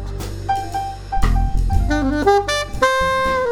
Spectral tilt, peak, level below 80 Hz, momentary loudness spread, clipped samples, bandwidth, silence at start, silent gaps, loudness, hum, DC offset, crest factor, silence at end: -5 dB/octave; 0 dBFS; -22 dBFS; 10 LU; under 0.1%; 16 kHz; 0 s; none; -19 LUFS; none; under 0.1%; 18 dB; 0 s